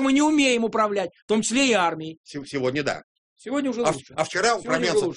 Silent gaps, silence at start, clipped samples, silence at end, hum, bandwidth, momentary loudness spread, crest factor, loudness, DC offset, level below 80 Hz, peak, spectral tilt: 1.22-1.28 s, 2.17-2.24 s, 3.04-3.36 s; 0 s; under 0.1%; 0 s; none; 10.5 kHz; 14 LU; 18 dB; -23 LUFS; under 0.1%; -60 dBFS; -6 dBFS; -3.5 dB/octave